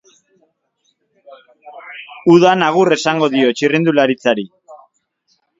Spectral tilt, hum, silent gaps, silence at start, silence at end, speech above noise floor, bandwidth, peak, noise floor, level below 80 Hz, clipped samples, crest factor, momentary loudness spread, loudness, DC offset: -5.5 dB/octave; none; none; 1.65 s; 0.85 s; 53 dB; 7.8 kHz; 0 dBFS; -65 dBFS; -60 dBFS; under 0.1%; 16 dB; 22 LU; -13 LUFS; under 0.1%